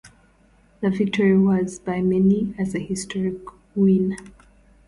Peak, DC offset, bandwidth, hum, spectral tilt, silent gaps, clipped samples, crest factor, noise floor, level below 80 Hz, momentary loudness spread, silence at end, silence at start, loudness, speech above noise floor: -8 dBFS; under 0.1%; 11.5 kHz; none; -7 dB/octave; none; under 0.1%; 14 dB; -56 dBFS; -52 dBFS; 10 LU; 0.55 s; 0.05 s; -21 LUFS; 36 dB